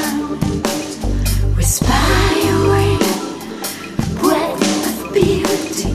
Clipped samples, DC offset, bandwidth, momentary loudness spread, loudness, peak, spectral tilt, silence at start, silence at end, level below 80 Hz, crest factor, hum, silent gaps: under 0.1%; 0.3%; 14 kHz; 9 LU; -17 LUFS; 0 dBFS; -4.5 dB/octave; 0 s; 0 s; -24 dBFS; 16 dB; none; none